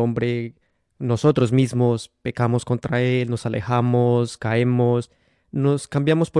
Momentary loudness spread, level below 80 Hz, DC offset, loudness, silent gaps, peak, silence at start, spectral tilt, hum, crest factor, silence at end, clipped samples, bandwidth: 9 LU; -56 dBFS; under 0.1%; -21 LUFS; none; -6 dBFS; 0 s; -7.5 dB/octave; none; 14 dB; 0 s; under 0.1%; 11.5 kHz